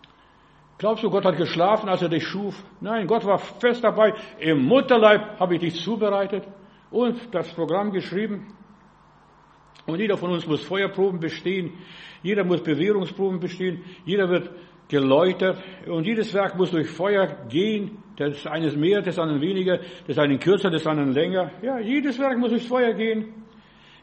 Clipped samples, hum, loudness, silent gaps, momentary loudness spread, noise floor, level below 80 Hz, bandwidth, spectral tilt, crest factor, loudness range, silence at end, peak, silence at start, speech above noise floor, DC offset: under 0.1%; none; -23 LUFS; none; 10 LU; -54 dBFS; -64 dBFS; 8.4 kHz; -7 dB/octave; 22 dB; 7 LU; 0.6 s; -2 dBFS; 0.8 s; 32 dB; under 0.1%